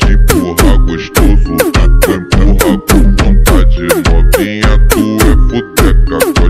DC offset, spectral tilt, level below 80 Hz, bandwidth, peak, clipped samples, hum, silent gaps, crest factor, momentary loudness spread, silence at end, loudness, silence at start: under 0.1%; -5.5 dB/octave; -8 dBFS; 16 kHz; 0 dBFS; 1%; none; none; 6 dB; 2 LU; 0 s; -10 LUFS; 0 s